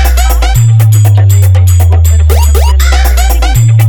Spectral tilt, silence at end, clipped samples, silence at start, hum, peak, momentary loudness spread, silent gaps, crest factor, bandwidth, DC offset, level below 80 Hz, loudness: -5 dB/octave; 0 s; 0.5%; 0 s; none; 0 dBFS; 3 LU; none; 4 dB; over 20 kHz; under 0.1%; -8 dBFS; -7 LUFS